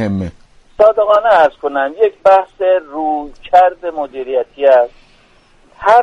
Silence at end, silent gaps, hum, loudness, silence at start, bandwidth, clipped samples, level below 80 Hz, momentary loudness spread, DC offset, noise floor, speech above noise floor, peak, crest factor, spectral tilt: 0 s; none; none; -13 LUFS; 0 s; 8.4 kHz; under 0.1%; -46 dBFS; 12 LU; under 0.1%; -48 dBFS; 36 dB; 0 dBFS; 14 dB; -6.5 dB/octave